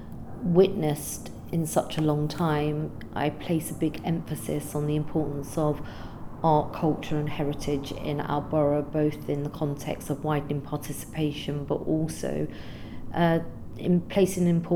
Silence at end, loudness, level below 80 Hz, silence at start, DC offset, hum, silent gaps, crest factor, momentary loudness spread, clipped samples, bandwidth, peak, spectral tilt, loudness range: 0 s; -28 LUFS; -46 dBFS; 0 s; under 0.1%; none; none; 20 dB; 10 LU; under 0.1%; 19 kHz; -8 dBFS; -6.5 dB/octave; 3 LU